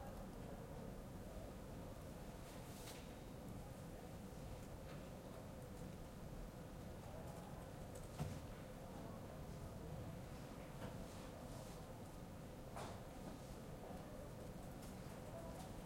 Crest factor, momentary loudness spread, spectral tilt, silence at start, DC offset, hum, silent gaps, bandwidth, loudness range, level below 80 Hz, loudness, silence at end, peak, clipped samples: 20 dB; 3 LU; -6 dB/octave; 0 s; under 0.1%; none; none; 16.5 kHz; 2 LU; -60 dBFS; -54 LUFS; 0 s; -34 dBFS; under 0.1%